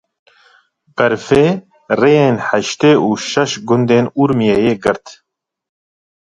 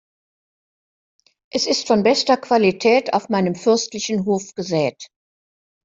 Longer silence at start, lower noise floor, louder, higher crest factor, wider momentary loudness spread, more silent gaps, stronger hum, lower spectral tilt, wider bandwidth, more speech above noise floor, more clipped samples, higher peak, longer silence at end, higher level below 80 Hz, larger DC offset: second, 0.95 s vs 1.55 s; second, -53 dBFS vs under -90 dBFS; first, -14 LUFS vs -19 LUFS; about the same, 14 dB vs 18 dB; about the same, 7 LU vs 7 LU; neither; neither; first, -5.5 dB/octave vs -4 dB/octave; first, 10.5 kHz vs 7.8 kHz; second, 40 dB vs over 72 dB; neither; about the same, 0 dBFS vs -2 dBFS; first, 1.1 s vs 0.8 s; first, -50 dBFS vs -62 dBFS; neither